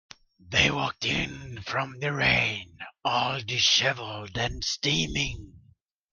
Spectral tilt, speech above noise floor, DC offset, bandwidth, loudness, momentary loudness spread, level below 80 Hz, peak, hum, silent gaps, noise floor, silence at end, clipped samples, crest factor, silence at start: -3 dB/octave; 34 dB; under 0.1%; 11 kHz; -26 LUFS; 13 LU; -48 dBFS; -6 dBFS; none; none; -62 dBFS; 0.55 s; under 0.1%; 22 dB; 0.45 s